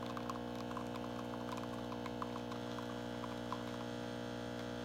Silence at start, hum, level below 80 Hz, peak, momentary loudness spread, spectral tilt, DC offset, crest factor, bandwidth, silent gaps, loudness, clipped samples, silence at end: 0 s; 60 Hz at -50 dBFS; -62 dBFS; -28 dBFS; 1 LU; -5.5 dB/octave; under 0.1%; 16 dB; 16.5 kHz; none; -44 LUFS; under 0.1%; 0 s